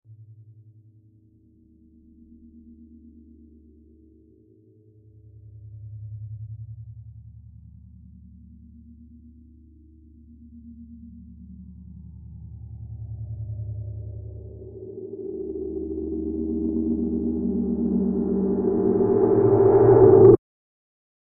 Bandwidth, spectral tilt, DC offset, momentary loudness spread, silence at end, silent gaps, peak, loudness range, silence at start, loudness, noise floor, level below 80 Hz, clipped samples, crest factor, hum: 2.2 kHz; -15 dB/octave; under 0.1%; 29 LU; 0.9 s; none; -2 dBFS; 28 LU; 0.1 s; -21 LUFS; -57 dBFS; -46 dBFS; under 0.1%; 22 dB; none